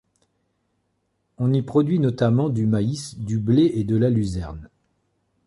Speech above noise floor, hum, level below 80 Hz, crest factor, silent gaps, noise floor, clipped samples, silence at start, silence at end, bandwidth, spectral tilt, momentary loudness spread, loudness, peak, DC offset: 51 dB; none; -46 dBFS; 16 dB; none; -72 dBFS; under 0.1%; 1.4 s; 0.8 s; 11.5 kHz; -8 dB/octave; 11 LU; -21 LUFS; -6 dBFS; under 0.1%